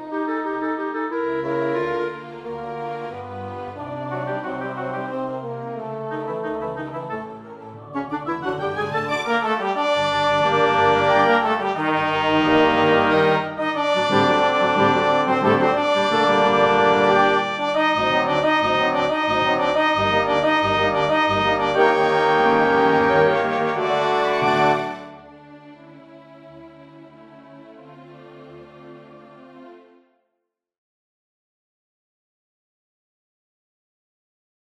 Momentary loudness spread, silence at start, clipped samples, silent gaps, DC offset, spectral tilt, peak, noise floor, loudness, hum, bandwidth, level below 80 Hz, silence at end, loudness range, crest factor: 14 LU; 0 s; under 0.1%; none; under 0.1%; -5.5 dB/octave; -2 dBFS; -79 dBFS; -19 LUFS; none; 10.5 kHz; -54 dBFS; 4.85 s; 11 LU; 18 dB